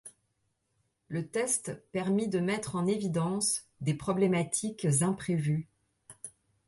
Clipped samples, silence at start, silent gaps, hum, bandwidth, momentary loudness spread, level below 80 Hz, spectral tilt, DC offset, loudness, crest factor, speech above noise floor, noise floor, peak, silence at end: under 0.1%; 0.05 s; none; none; 12 kHz; 11 LU; -66 dBFS; -5 dB/octave; under 0.1%; -31 LUFS; 16 dB; 48 dB; -78 dBFS; -16 dBFS; 0.4 s